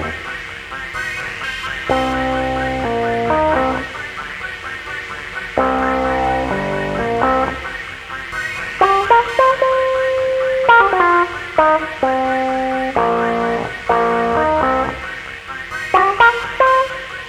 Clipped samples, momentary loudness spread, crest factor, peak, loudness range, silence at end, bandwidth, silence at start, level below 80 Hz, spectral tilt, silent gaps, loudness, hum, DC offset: under 0.1%; 13 LU; 16 dB; 0 dBFS; 6 LU; 0 s; 14 kHz; 0 s; -38 dBFS; -5 dB/octave; none; -17 LUFS; none; under 0.1%